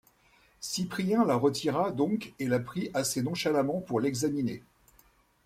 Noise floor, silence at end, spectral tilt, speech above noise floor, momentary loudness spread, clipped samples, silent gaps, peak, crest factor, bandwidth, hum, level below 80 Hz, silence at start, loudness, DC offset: -64 dBFS; 0.85 s; -5 dB/octave; 35 dB; 7 LU; under 0.1%; none; -14 dBFS; 18 dB; 16 kHz; none; -64 dBFS; 0.6 s; -30 LUFS; under 0.1%